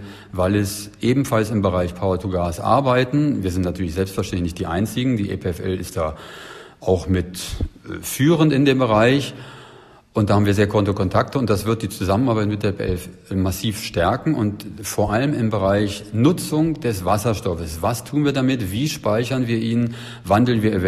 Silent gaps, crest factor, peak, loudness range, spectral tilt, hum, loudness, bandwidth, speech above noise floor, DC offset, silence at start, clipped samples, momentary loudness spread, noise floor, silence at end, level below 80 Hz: none; 18 dB; -2 dBFS; 5 LU; -6 dB/octave; none; -20 LUFS; 14.5 kHz; 26 dB; under 0.1%; 0 s; under 0.1%; 11 LU; -46 dBFS; 0 s; -40 dBFS